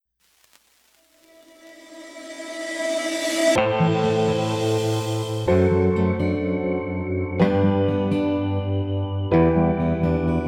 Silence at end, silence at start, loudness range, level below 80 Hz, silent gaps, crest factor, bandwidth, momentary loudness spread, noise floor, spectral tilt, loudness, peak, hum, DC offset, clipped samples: 0 s; 1.65 s; 5 LU; -44 dBFS; none; 16 dB; 16 kHz; 8 LU; -62 dBFS; -6.5 dB/octave; -22 LUFS; -6 dBFS; none; under 0.1%; under 0.1%